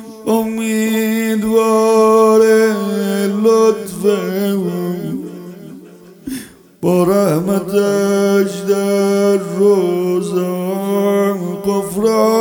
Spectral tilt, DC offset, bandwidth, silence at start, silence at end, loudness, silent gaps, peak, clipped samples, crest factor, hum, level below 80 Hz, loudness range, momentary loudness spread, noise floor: -6 dB/octave; under 0.1%; 18.5 kHz; 0 s; 0 s; -14 LUFS; none; -2 dBFS; under 0.1%; 14 dB; none; -54 dBFS; 6 LU; 11 LU; -39 dBFS